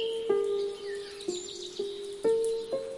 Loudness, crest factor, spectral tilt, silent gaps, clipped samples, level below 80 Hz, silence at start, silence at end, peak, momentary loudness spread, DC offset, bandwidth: -32 LUFS; 16 dB; -3 dB/octave; none; under 0.1%; -68 dBFS; 0 s; 0 s; -16 dBFS; 9 LU; under 0.1%; 11.5 kHz